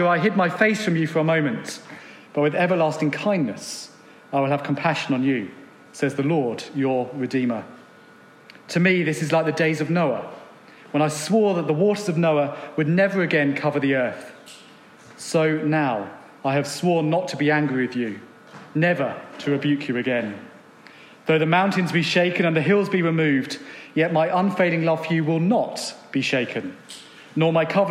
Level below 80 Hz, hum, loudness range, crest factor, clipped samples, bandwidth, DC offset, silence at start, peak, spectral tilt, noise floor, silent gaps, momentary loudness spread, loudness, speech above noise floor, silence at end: -78 dBFS; none; 4 LU; 20 dB; under 0.1%; 14 kHz; under 0.1%; 0 s; -4 dBFS; -6 dB/octave; -49 dBFS; none; 13 LU; -22 LUFS; 27 dB; 0 s